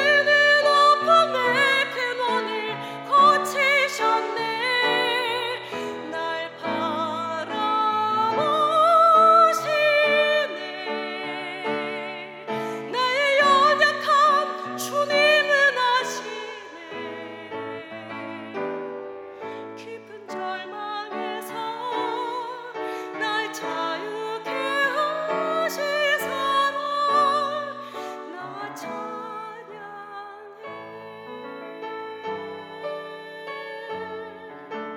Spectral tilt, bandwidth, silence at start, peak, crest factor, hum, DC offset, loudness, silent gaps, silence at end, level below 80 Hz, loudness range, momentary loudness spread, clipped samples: -2.5 dB/octave; 16 kHz; 0 s; -4 dBFS; 20 dB; none; under 0.1%; -22 LUFS; none; 0 s; -82 dBFS; 16 LU; 20 LU; under 0.1%